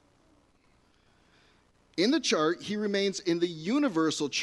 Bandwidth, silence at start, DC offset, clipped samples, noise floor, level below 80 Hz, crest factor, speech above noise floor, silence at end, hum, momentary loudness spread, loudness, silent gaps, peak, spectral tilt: 11.5 kHz; 1.95 s; under 0.1%; under 0.1%; -65 dBFS; -72 dBFS; 18 dB; 37 dB; 0 s; none; 5 LU; -28 LUFS; none; -14 dBFS; -4 dB/octave